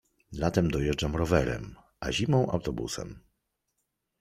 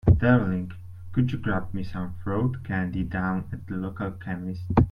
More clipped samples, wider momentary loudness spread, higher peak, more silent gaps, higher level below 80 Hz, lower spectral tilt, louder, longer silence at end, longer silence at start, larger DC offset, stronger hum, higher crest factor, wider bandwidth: neither; about the same, 12 LU vs 12 LU; about the same, -8 dBFS vs -8 dBFS; neither; second, -44 dBFS vs -38 dBFS; second, -6 dB/octave vs -10 dB/octave; about the same, -29 LUFS vs -27 LUFS; first, 1 s vs 0 s; first, 0.3 s vs 0.05 s; neither; neither; about the same, 22 dB vs 18 dB; first, 15 kHz vs 5.4 kHz